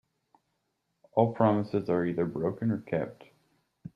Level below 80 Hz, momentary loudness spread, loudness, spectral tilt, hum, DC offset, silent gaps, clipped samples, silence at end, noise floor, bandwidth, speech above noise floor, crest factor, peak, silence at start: -66 dBFS; 9 LU; -29 LUFS; -10 dB/octave; none; under 0.1%; none; under 0.1%; 0.1 s; -79 dBFS; 5.8 kHz; 51 dB; 22 dB; -10 dBFS; 1.15 s